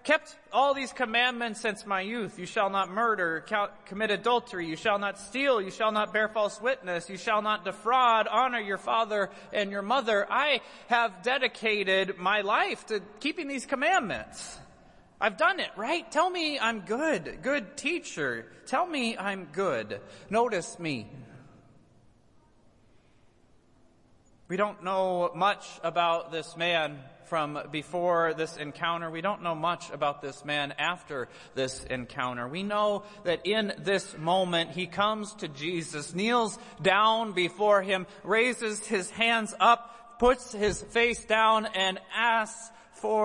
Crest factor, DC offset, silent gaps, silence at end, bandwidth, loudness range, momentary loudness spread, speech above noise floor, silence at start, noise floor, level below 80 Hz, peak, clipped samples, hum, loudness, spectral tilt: 20 dB; under 0.1%; none; 0 s; 11.5 kHz; 6 LU; 10 LU; 32 dB; 0.05 s; -61 dBFS; -60 dBFS; -8 dBFS; under 0.1%; none; -28 LUFS; -3.5 dB/octave